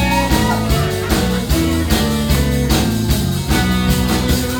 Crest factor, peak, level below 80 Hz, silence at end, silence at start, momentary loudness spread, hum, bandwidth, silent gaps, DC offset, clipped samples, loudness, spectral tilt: 14 dB; 0 dBFS; -22 dBFS; 0 s; 0 s; 2 LU; none; over 20 kHz; none; under 0.1%; under 0.1%; -16 LUFS; -5 dB/octave